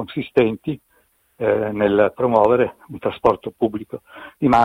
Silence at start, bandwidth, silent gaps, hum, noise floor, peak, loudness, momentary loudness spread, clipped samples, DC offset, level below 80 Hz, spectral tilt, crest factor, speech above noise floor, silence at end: 0 s; 15.5 kHz; none; none; -61 dBFS; -2 dBFS; -20 LUFS; 15 LU; under 0.1%; under 0.1%; -50 dBFS; -8 dB/octave; 18 dB; 42 dB; 0 s